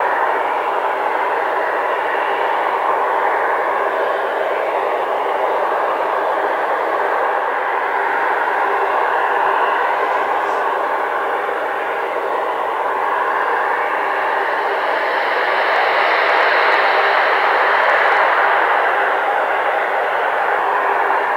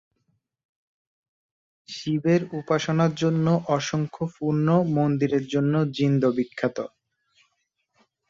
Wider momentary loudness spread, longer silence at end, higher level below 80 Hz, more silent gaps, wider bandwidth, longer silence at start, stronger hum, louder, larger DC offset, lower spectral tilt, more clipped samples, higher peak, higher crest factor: about the same, 5 LU vs 7 LU; second, 0 s vs 1.45 s; second, -70 dBFS vs -62 dBFS; neither; first, 16.5 kHz vs 7.6 kHz; second, 0 s vs 1.9 s; neither; first, -17 LUFS vs -24 LUFS; neither; second, -2.5 dB/octave vs -7 dB/octave; neither; first, -4 dBFS vs -8 dBFS; about the same, 14 dB vs 16 dB